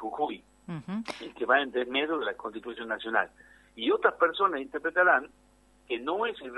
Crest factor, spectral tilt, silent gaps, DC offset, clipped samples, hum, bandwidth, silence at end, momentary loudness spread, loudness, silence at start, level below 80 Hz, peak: 22 dB; -5.5 dB/octave; none; under 0.1%; under 0.1%; none; 11.5 kHz; 0 s; 14 LU; -29 LUFS; 0 s; -66 dBFS; -8 dBFS